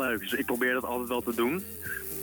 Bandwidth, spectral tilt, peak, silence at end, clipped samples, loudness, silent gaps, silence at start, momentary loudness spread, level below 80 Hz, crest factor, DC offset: 19.5 kHz; -4 dB/octave; -16 dBFS; 0 s; under 0.1%; -30 LUFS; none; 0 s; 7 LU; -58 dBFS; 14 dB; under 0.1%